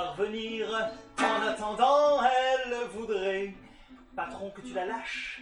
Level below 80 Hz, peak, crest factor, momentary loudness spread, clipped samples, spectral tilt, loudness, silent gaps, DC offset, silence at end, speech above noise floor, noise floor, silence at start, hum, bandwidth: -60 dBFS; -12 dBFS; 18 dB; 14 LU; under 0.1%; -3.5 dB/octave; -29 LUFS; none; under 0.1%; 0 s; 24 dB; -52 dBFS; 0 s; none; 11 kHz